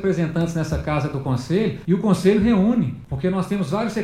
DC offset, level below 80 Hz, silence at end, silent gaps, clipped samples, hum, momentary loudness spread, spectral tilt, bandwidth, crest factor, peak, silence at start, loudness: under 0.1%; -40 dBFS; 0 s; none; under 0.1%; none; 7 LU; -7.5 dB/octave; 13.5 kHz; 16 dB; -4 dBFS; 0 s; -21 LUFS